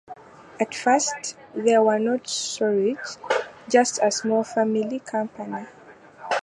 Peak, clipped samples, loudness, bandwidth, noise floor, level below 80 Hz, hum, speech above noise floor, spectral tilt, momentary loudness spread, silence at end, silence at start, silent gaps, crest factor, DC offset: -4 dBFS; under 0.1%; -23 LUFS; 11.5 kHz; -45 dBFS; -72 dBFS; none; 22 dB; -3 dB/octave; 14 LU; 0.05 s; 0.1 s; none; 20 dB; under 0.1%